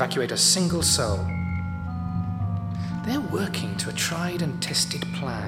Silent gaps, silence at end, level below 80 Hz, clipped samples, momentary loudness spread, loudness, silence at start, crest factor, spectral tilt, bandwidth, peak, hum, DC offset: none; 0 s; -46 dBFS; under 0.1%; 10 LU; -25 LUFS; 0 s; 18 dB; -3.5 dB/octave; 16.5 kHz; -6 dBFS; none; under 0.1%